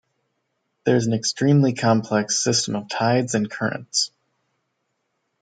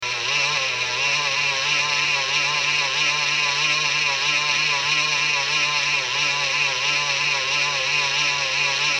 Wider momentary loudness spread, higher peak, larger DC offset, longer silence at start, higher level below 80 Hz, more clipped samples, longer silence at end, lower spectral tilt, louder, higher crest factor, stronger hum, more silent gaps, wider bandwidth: first, 8 LU vs 1 LU; about the same, -6 dBFS vs -8 dBFS; neither; first, 0.85 s vs 0 s; second, -66 dBFS vs -60 dBFS; neither; first, 1.35 s vs 0 s; first, -4.5 dB/octave vs 0 dB/octave; about the same, -21 LUFS vs -19 LUFS; about the same, 18 dB vs 14 dB; neither; neither; second, 9.6 kHz vs 18 kHz